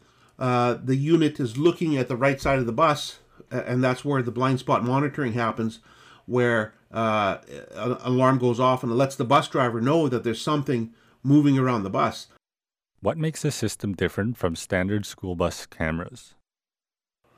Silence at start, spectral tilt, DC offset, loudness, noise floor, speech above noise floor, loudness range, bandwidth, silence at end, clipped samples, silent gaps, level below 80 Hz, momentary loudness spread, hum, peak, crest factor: 0.4 s; -6.5 dB/octave; under 0.1%; -24 LUFS; under -90 dBFS; over 66 dB; 5 LU; 15.5 kHz; 1.15 s; under 0.1%; none; -54 dBFS; 9 LU; none; -8 dBFS; 16 dB